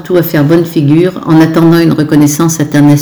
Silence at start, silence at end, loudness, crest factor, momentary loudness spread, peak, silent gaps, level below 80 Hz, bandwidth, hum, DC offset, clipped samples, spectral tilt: 0 s; 0 s; -8 LUFS; 6 dB; 3 LU; 0 dBFS; none; -42 dBFS; over 20 kHz; none; under 0.1%; 8%; -6.5 dB/octave